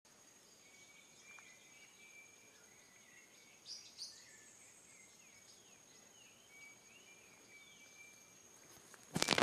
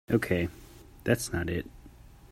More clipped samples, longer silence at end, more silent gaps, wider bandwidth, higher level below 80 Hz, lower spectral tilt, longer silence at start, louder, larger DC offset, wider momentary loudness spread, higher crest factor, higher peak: neither; about the same, 0 s vs 0.05 s; neither; second, 14 kHz vs 16 kHz; second, -82 dBFS vs -50 dBFS; second, -2 dB/octave vs -5.5 dB/octave; about the same, 0.05 s vs 0.1 s; second, -52 LUFS vs -31 LUFS; neither; second, 10 LU vs 15 LU; first, 42 dB vs 22 dB; about the same, -6 dBFS vs -8 dBFS